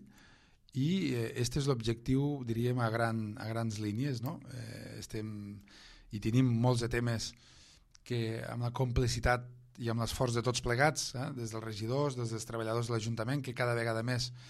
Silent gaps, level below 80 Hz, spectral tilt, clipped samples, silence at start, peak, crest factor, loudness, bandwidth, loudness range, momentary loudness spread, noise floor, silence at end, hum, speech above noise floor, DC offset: none; -52 dBFS; -5.5 dB/octave; under 0.1%; 0 s; -12 dBFS; 22 dB; -34 LUFS; 14 kHz; 3 LU; 12 LU; -62 dBFS; 0 s; none; 29 dB; under 0.1%